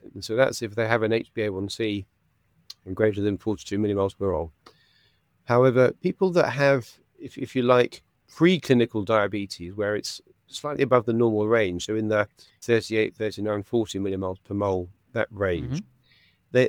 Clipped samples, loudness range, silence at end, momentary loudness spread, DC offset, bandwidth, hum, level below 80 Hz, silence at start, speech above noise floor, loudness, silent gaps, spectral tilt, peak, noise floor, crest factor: under 0.1%; 5 LU; 0 s; 13 LU; under 0.1%; 17 kHz; none; -56 dBFS; 0.05 s; 42 dB; -25 LUFS; none; -6 dB/octave; -2 dBFS; -66 dBFS; 22 dB